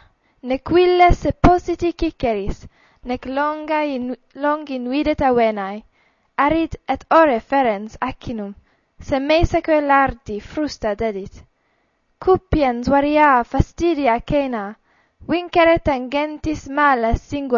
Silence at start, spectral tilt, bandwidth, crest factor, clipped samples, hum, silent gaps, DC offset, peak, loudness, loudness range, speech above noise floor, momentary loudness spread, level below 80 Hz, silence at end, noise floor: 0.45 s; -6.5 dB/octave; 7.4 kHz; 18 dB; under 0.1%; none; none; under 0.1%; -2 dBFS; -18 LUFS; 3 LU; 47 dB; 15 LU; -32 dBFS; 0 s; -65 dBFS